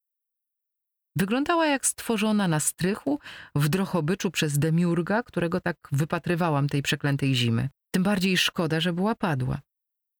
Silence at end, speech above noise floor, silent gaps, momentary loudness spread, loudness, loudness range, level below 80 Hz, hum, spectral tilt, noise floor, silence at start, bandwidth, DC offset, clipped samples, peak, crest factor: 0.6 s; 59 dB; none; 6 LU; -25 LUFS; 1 LU; -56 dBFS; none; -5 dB/octave; -84 dBFS; 1.15 s; over 20 kHz; under 0.1%; under 0.1%; -10 dBFS; 14 dB